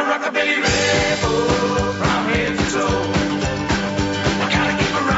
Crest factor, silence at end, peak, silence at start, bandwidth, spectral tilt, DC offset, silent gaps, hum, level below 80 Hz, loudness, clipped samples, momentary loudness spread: 16 dB; 0 s; -4 dBFS; 0 s; 8 kHz; -4.5 dB/octave; under 0.1%; none; none; -34 dBFS; -18 LUFS; under 0.1%; 4 LU